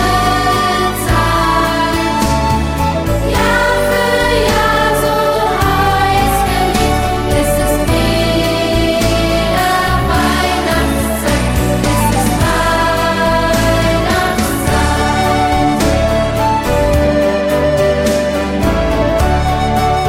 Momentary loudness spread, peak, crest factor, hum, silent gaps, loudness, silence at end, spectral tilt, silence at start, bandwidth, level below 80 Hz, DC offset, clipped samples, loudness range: 2 LU; 0 dBFS; 12 dB; none; none; -13 LUFS; 0 s; -5 dB/octave; 0 s; 16.5 kHz; -22 dBFS; under 0.1%; under 0.1%; 1 LU